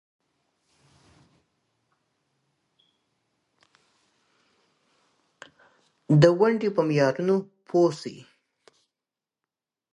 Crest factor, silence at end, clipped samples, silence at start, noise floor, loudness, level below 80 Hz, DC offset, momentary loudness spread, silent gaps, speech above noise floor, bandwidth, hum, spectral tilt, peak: 26 dB; 1.8 s; under 0.1%; 6.1 s; -90 dBFS; -22 LUFS; -66 dBFS; under 0.1%; 9 LU; none; 68 dB; 10.5 kHz; none; -7.5 dB/octave; -2 dBFS